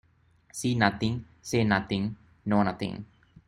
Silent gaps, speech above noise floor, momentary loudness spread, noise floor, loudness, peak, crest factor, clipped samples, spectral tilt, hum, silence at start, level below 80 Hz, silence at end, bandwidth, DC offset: none; 36 dB; 12 LU; -63 dBFS; -28 LUFS; -6 dBFS; 24 dB; under 0.1%; -5.5 dB/octave; none; 0.55 s; -56 dBFS; 0.45 s; 15 kHz; under 0.1%